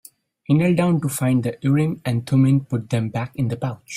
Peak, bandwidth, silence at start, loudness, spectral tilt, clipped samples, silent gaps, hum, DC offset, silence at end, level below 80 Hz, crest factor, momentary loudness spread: -6 dBFS; 16 kHz; 0.5 s; -21 LUFS; -7 dB/octave; under 0.1%; none; none; under 0.1%; 0 s; -56 dBFS; 14 dB; 8 LU